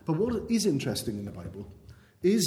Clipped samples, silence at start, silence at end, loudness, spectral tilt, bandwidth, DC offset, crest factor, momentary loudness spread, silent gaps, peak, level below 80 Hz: under 0.1%; 0.05 s; 0 s; -29 LUFS; -5 dB/octave; 17.5 kHz; under 0.1%; 14 dB; 16 LU; none; -14 dBFS; -54 dBFS